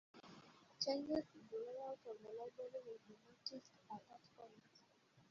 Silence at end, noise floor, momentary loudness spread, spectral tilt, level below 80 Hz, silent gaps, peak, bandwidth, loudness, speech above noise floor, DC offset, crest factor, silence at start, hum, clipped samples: 0 s; -73 dBFS; 21 LU; -3 dB/octave; -84 dBFS; none; -26 dBFS; 7.4 kHz; -49 LUFS; 23 dB; under 0.1%; 24 dB; 0.15 s; none; under 0.1%